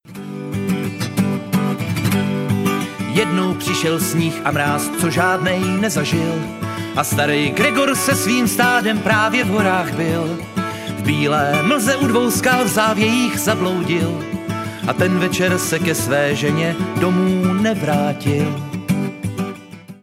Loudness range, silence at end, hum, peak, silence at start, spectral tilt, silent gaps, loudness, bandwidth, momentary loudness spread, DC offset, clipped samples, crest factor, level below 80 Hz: 3 LU; 0.05 s; none; 0 dBFS; 0.05 s; -4.5 dB/octave; none; -18 LUFS; 16.5 kHz; 9 LU; under 0.1%; under 0.1%; 18 dB; -50 dBFS